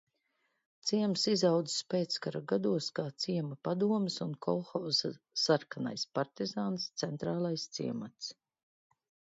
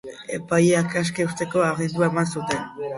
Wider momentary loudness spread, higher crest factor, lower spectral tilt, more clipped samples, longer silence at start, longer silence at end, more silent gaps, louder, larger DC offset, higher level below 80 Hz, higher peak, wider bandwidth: about the same, 8 LU vs 9 LU; about the same, 20 dB vs 16 dB; about the same, -5 dB/octave vs -5.5 dB/octave; neither; first, 0.85 s vs 0.05 s; first, 1.05 s vs 0 s; neither; second, -34 LUFS vs -23 LUFS; neither; second, -78 dBFS vs -58 dBFS; second, -14 dBFS vs -6 dBFS; second, 7.8 kHz vs 11.5 kHz